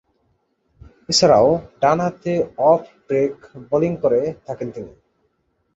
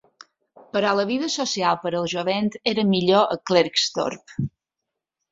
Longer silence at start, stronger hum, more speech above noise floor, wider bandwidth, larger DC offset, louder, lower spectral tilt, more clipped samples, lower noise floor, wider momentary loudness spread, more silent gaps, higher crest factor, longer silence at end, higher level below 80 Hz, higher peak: first, 1.1 s vs 0.75 s; neither; second, 49 dB vs 62 dB; about the same, 8.2 kHz vs 7.8 kHz; neither; first, -19 LUFS vs -22 LUFS; about the same, -4.5 dB/octave vs -4.5 dB/octave; neither; second, -68 dBFS vs -84 dBFS; first, 16 LU vs 10 LU; neither; about the same, 18 dB vs 20 dB; about the same, 0.85 s vs 0.85 s; first, -52 dBFS vs -60 dBFS; about the same, -2 dBFS vs -4 dBFS